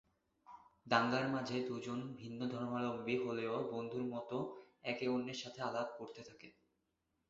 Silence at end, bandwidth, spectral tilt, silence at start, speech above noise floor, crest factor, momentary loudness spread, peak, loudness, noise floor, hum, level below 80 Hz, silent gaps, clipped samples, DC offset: 0.8 s; 7.6 kHz; -4 dB/octave; 0.5 s; 44 dB; 26 dB; 20 LU; -16 dBFS; -40 LUFS; -85 dBFS; none; -78 dBFS; none; under 0.1%; under 0.1%